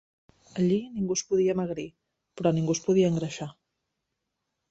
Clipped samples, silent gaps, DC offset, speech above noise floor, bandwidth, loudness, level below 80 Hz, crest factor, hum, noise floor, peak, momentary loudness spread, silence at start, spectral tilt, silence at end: under 0.1%; none; under 0.1%; 56 dB; 8.2 kHz; -27 LUFS; -64 dBFS; 18 dB; none; -82 dBFS; -10 dBFS; 15 LU; 0.55 s; -6 dB/octave; 1.2 s